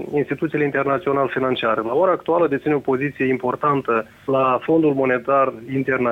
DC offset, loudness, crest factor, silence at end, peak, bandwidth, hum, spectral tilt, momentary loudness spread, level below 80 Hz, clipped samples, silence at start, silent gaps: under 0.1%; -20 LUFS; 14 dB; 0 s; -6 dBFS; 7.2 kHz; none; -8 dB/octave; 5 LU; -58 dBFS; under 0.1%; 0 s; none